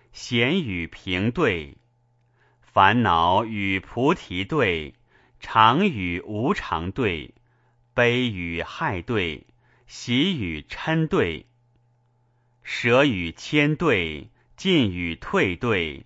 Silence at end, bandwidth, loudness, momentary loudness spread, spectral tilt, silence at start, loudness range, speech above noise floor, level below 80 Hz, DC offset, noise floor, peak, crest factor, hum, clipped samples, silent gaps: 0 s; 8 kHz; -23 LUFS; 12 LU; -6 dB/octave; 0.15 s; 4 LU; 42 dB; -48 dBFS; under 0.1%; -64 dBFS; 0 dBFS; 24 dB; none; under 0.1%; none